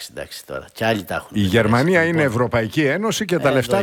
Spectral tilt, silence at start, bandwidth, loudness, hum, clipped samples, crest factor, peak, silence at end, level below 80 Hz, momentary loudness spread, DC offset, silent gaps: -5.5 dB/octave; 0 s; 18.5 kHz; -18 LUFS; none; under 0.1%; 16 dB; -4 dBFS; 0 s; -48 dBFS; 15 LU; under 0.1%; none